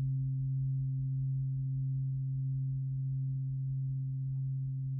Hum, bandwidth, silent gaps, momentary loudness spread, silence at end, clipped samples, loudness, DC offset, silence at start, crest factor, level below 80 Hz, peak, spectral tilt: none; 0.3 kHz; none; 2 LU; 0 s; under 0.1%; -35 LUFS; under 0.1%; 0 s; 6 dB; -56 dBFS; -28 dBFS; -27 dB/octave